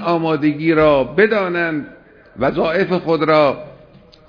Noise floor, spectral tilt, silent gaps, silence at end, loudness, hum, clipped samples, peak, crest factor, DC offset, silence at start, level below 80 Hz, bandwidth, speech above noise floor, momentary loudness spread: -45 dBFS; -8.5 dB/octave; none; 0.55 s; -16 LUFS; none; under 0.1%; 0 dBFS; 16 dB; under 0.1%; 0 s; -46 dBFS; 5.4 kHz; 30 dB; 8 LU